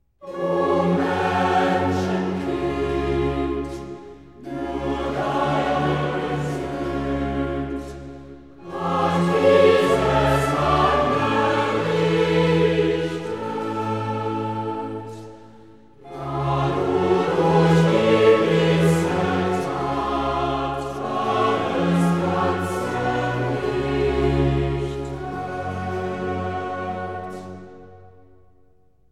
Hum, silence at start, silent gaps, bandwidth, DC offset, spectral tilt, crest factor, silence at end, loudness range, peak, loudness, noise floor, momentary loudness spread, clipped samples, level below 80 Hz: none; 0.2 s; none; 13.5 kHz; 0.3%; -6.5 dB/octave; 18 dB; 1.05 s; 9 LU; -4 dBFS; -21 LUFS; -59 dBFS; 14 LU; under 0.1%; -40 dBFS